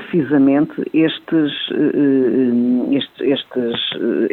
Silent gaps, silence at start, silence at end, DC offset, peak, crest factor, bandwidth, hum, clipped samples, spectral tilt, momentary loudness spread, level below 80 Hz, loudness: none; 0 s; 0.05 s; under 0.1%; -4 dBFS; 12 dB; 4.2 kHz; none; under 0.1%; -8.5 dB/octave; 5 LU; -64 dBFS; -17 LUFS